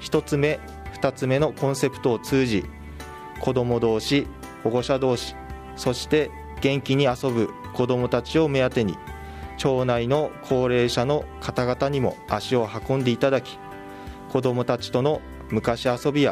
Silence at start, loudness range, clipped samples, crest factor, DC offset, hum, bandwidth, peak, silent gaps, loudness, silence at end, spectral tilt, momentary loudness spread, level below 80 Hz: 0 s; 2 LU; under 0.1%; 18 dB; under 0.1%; none; 15.5 kHz; -6 dBFS; none; -24 LUFS; 0 s; -6 dB/octave; 16 LU; -46 dBFS